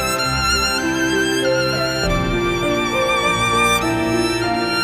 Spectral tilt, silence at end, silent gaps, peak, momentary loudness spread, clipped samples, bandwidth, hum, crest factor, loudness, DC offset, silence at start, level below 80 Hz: -3.5 dB/octave; 0 s; none; -4 dBFS; 3 LU; under 0.1%; 16 kHz; none; 14 dB; -17 LUFS; under 0.1%; 0 s; -34 dBFS